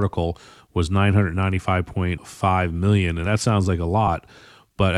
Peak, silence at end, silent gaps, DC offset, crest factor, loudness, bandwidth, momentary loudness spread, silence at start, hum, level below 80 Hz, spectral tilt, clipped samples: -4 dBFS; 0 s; none; under 0.1%; 16 dB; -22 LUFS; 11 kHz; 8 LU; 0 s; none; -42 dBFS; -6.5 dB/octave; under 0.1%